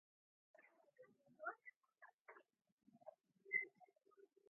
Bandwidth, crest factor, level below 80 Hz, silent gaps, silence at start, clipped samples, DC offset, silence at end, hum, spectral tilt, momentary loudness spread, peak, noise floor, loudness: 2.8 kHz; 28 dB; under -90 dBFS; 1.76-1.81 s, 2.14-2.25 s, 2.72-2.78 s; 0.6 s; under 0.1%; under 0.1%; 0.25 s; none; 5 dB/octave; 24 LU; -30 dBFS; -74 dBFS; -48 LUFS